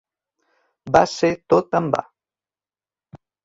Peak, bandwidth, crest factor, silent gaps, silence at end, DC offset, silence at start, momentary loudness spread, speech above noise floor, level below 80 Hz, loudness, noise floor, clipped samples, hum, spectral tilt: -2 dBFS; 7.8 kHz; 20 dB; none; 0.3 s; under 0.1%; 0.85 s; 6 LU; over 72 dB; -54 dBFS; -19 LUFS; under -90 dBFS; under 0.1%; none; -5.5 dB/octave